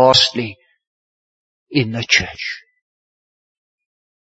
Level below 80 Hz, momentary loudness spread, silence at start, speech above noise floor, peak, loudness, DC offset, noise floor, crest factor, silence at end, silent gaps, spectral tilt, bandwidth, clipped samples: -52 dBFS; 15 LU; 0 s; over 74 dB; 0 dBFS; -17 LUFS; under 0.1%; under -90 dBFS; 20 dB; 1.7 s; 0.87-1.66 s; -3.5 dB/octave; 8 kHz; under 0.1%